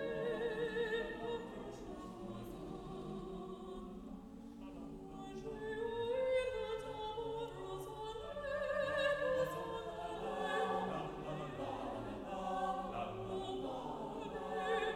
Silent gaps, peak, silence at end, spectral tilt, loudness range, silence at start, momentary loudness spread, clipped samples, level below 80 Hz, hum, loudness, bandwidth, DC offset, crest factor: none; -24 dBFS; 0 s; -5.5 dB/octave; 9 LU; 0 s; 12 LU; under 0.1%; -60 dBFS; none; -42 LUFS; 16 kHz; under 0.1%; 16 dB